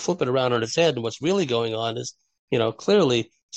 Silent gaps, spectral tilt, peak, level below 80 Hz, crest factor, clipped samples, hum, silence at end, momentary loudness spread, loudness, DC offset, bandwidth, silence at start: 2.39-2.48 s, 3.43-3.49 s; -5 dB/octave; -8 dBFS; -64 dBFS; 16 dB; under 0.1%; none; 0 s; 8 LU; -23 LUFS; under 0.1%; 8.6 kHz; 0 s